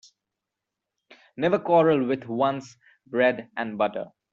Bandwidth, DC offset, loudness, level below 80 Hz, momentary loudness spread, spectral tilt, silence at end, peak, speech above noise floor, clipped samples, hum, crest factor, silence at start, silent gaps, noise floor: 7.6 kHz; under 0.1%; -24 LUFS; -68 dBFS; 12 LU; -4.5 dB/octave; 0.25 s; -8 dBFS; 62 dB; under 0.1%; none; 18 dB; 1.35 s; none; -86 dBFS